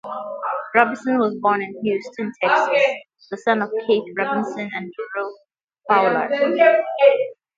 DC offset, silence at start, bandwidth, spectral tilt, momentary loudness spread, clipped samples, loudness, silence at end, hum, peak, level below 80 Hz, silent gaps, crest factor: under 0.1%; 0.05 s; 7.6 kHz; -5.5 dB/octave; 13 LU; under 0.1%; -20 LUFS; 0.25 s; none; 0 dBFS; -72 dBFS; none; 20 dB